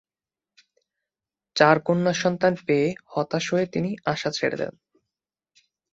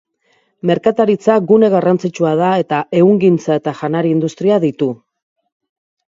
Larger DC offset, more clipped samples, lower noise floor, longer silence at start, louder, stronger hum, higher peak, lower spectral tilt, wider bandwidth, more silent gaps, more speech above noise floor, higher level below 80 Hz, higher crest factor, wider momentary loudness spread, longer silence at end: neither; neither; first, under -90 dBFS vs -60 dBFS; first, 1.55 s vs 0.65 s; second, -23 LUFS vs -14 LUFS; neither; about the same, -2 dBFS vs 0 dBFS; second, -5 dB/octave vs -7.5 dB/octave; about the same, 8 kHz vs 7.6 kHz; neither; first, over 67 dB vs 47 dB; about the same, -64 dBFS vs -62 dBFS; first, 24 dB vs 14 dB; about the same, 10 LU vs 8 LU; about the same, 1.25 s vs 1.15 s